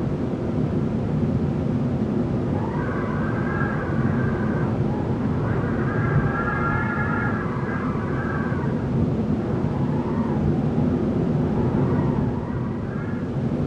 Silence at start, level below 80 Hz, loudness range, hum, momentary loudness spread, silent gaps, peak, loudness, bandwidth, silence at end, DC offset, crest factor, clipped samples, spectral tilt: 0 s; -38 dBFS; 1 LU; none; 4 LU; none; -8 dBFS; -24 LUFS; 7.8 kHz; 0 s; under 0.1%; 14 dB; under 0.1%; -9.5 dB/octave